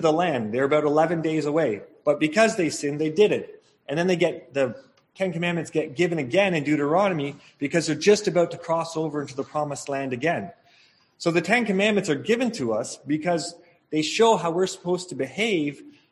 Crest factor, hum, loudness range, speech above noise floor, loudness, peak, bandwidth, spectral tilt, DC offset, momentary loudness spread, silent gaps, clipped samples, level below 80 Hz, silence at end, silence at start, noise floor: 20 dB; none; 2 LU; 36 dB; -24 LUFS; -4 dBFS; 12 kHz; -5 dB/octave; under 0.1%; 9 LU; none; under 0.1%; -66 dBFS; 0.2 s; 0 s; -59 dBFS